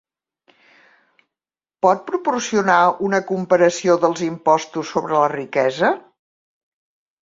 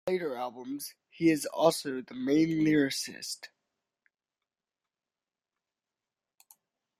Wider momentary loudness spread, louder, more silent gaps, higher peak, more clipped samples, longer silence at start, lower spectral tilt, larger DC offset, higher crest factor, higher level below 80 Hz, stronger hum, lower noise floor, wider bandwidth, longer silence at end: second, 6 LU vs 13 LU; first, -18 LUFS vs -30 LUFS; neither; first, -2 dBFS vs -10 dBFS; neither; first, 1.85 s vs 0.05 s; about the same, -4.5 dB/octave vs -4.5 dB/octave; neither; about the same, 18 dB vs 22 dB; first, -64 dBFS vs -74 dBFS; neither; about the same, under -90 dBFS vs under -90 dBFS; second, 7.8 kHz vs 15.5 kHz; second, 1.2 s vs 3.55 s